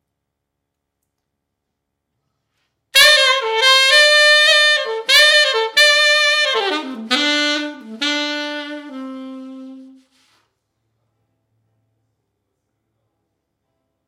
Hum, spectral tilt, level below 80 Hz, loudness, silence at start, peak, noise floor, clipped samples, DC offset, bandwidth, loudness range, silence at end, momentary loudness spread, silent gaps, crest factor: none; 1 dB/octave; -68 dBFS; -12 LUFS; 2.95 s; 0 dBFS; -77 dBFS; under 0.1%; under 0.1%; 16 kHz; 15 LU; 4.25 s; 21 LU; none; 18 dB